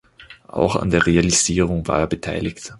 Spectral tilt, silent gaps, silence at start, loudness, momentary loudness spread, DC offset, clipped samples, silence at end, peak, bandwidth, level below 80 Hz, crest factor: -4 dB/octave; none; 0.2 s; -19 LUFS; 10 LU; under 0.1%; under 0.1%; 0 s; 0 dBFS; 11.5 kHz; -36 dBFS; 20 dB